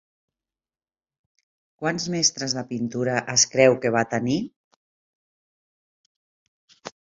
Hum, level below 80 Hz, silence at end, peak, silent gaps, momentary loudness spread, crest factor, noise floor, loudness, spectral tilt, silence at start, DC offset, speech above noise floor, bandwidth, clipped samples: none; -64 dBFS; 0.1 s; -4 dBFS; 4.56-6.68 s; 12 LU; 24 dB; under -90 dBFS; -22 LUFS; -3 dB/octave; 1.8 s; under 0.1%; over 68 dB; 8 kHz; under 0.1%